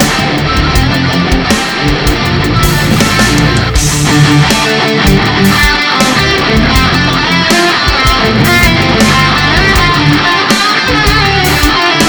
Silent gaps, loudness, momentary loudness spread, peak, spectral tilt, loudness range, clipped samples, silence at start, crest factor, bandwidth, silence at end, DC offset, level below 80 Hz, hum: none; -8 LUFS; 4 LU; 0 dBFS; -4 dB/octave; 2 LU; 2%; 0 s; 8 dB; over 20 kHz; 0 s; 0.1%; -18 dBFS; none